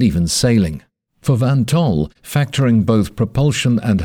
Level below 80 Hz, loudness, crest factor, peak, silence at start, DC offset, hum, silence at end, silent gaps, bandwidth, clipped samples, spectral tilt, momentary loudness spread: -36 dBFS; -16 LUFS; 14 dB; -2 dBFS; 0 s; under 0.1%; none; 0 s; none; 18 kHz; under 0.1%; -6 dB/octave; 7 LU